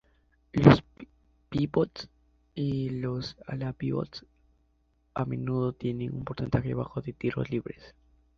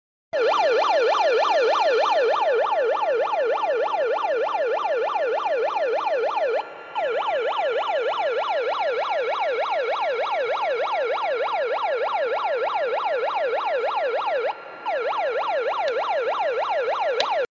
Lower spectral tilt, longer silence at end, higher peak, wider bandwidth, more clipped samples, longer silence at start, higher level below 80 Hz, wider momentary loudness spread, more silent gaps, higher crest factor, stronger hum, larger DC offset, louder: first, -8.5 dB/octave vs -1.5 dB/octave; first, 0.5 s vs 0.05 s; about the same, -2 dBFS vs -4 dBFS; about the same, 7 kHz vs 7.6 kHz; neither; first, 0.55 s vs 0.35 s; first, -52 dBFS vs -78 dBFS; first, 17 LU vs 5 LU; neither; first, 28 dB vs 18 dB; neither; neither; second, -29 LUFS vs -23 LUFS